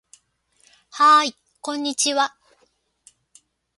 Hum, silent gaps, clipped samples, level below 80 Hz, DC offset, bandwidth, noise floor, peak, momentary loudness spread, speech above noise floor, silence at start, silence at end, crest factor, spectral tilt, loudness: none; none; under 0.1%; -78 dBFS; under 0.1%; 11.5 kHz; -65 dBFS; -4 dBFS; 17 LU; 47 dB; 0.95 s; 1.5 s; 18 dB; 0.5 dB/octave; -19 LUFS